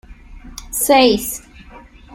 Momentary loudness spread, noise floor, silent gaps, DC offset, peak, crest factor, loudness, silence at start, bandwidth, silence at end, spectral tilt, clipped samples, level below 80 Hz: 24 LU; -41 dBFS; none; under 0.1%; -2 dBFS; 16 dB; -15 LUFS; 0.1 s; 16.5 kHz; 0 s; -2.5 dB/octave; under 0.1%; -40 dBFS